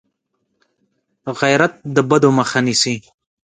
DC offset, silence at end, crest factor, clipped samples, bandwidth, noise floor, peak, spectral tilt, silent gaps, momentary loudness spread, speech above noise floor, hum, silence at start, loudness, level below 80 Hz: under 0.1%; 0.45 s; 18 dB; under 0.1%; 9.6 kHz; -71 dBFS; 0 dBFS; -4.5 dB/octave; none; 14 LU; 55 dB; none; 1.25 s; -16 LUFS; -60 dBFS